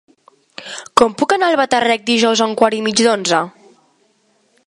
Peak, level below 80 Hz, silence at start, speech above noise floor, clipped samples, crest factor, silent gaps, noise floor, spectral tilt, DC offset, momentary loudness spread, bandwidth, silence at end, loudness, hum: 0 dBFS; -58 dBFS; 0.6 s; 45 dB; under 0.1%; 16 dB; none; -59 dBFS; -3 dB/octave; under 0.1%; 14 LU; 11.5 kHz; 1.2 s; -14 LUFS; none